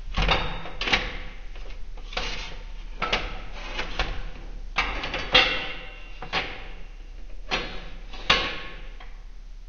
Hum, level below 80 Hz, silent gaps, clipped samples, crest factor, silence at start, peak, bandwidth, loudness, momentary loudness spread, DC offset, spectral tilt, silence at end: none; -36 dBFS; none; under 0.1%; 26 dB; 0 s; -2 dBFS; 7.2 kHz; -26 LUFS; 22 LU; under 0.1%; -3 dB/octave; 0 s